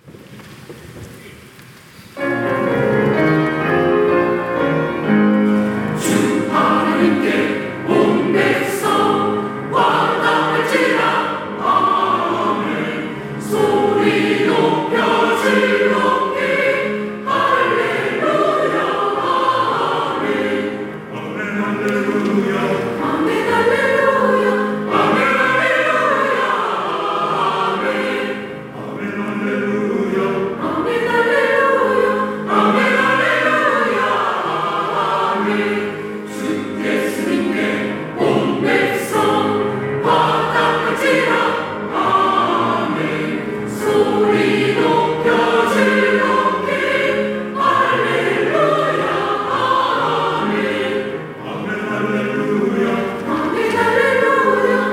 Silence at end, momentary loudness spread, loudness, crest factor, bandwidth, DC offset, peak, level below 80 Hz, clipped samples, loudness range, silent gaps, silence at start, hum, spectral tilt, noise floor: 0 s; 8 LU; -16 LUFS; 14 dB; 16.5 kHz; under 0.1%; -2 dBFS; -56 dBFS; under 0.1%; 4 LU; none; 0.05 s; none; -5.5 dB/octave; -41 dBFS